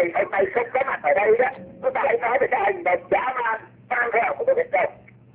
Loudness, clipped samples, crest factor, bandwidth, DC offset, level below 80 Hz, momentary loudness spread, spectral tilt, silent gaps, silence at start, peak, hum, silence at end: -22 LUFS; under 0.1%; 16 dB; 4 kHz; under 0.1%; -60 dBFS; 7 LU; -8 dB/octave; none; 0 s; -6 dBFS; none; 0.4 s